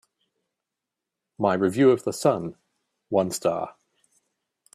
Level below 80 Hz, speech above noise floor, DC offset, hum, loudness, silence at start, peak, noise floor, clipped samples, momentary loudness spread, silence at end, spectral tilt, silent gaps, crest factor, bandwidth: -68 dBFS; 64 dB; under 0.1%; none; -24 LUFS; 1.4 s; -6 dBFS; -86 dBFS; under 0.1%; 12 LU; 1.05 s; -5.5 dB/octave; none; 20 dB; 14 kHz